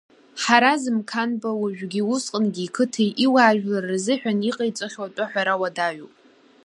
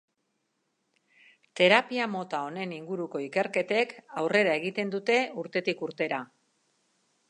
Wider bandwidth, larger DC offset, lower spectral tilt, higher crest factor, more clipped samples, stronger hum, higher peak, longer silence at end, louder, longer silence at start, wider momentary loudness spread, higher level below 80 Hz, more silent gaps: about the same, 11.5 kHz vs 11 kHz; neither; about the same, -4 dB/octave vs -4.5 dB/octave; about the same, 22 dB vs 24 dB; neither; neither; first, -2 dBFS vs -6 dBFS; second, 0.55 s vs 1.05 s; first, -22 LUFS vs -28 LUFS; second, 0.35 s vs 1.55 s; about the same, 10 LU vs 12 LU; first, -74 dBFS vs -82 dBFS; neither